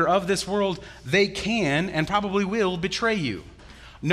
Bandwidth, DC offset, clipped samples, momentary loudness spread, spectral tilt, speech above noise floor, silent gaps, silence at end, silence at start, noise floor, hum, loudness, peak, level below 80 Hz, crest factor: 13.5 kHz; under 0.1%; under 0.1%; 8 LU; -5 dB/octave; 22 dB; none; 0 s; 0 s; -46 dBFS; none; -24 LUFS; -6 dBFS; -48 dBFS; 18 dB